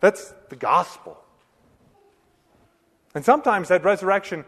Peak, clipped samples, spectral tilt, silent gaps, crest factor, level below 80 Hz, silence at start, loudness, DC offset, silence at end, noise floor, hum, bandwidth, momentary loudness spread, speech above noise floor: -2 dBFS; under 0.1%; -5 dB/octave; none; 22 dB; -66 dBFS; 0 s; -21 LUFS; under 0.1%; 0.05 s; -62 dBFS; none; 13.5 kHz; 19 LU; 41 dB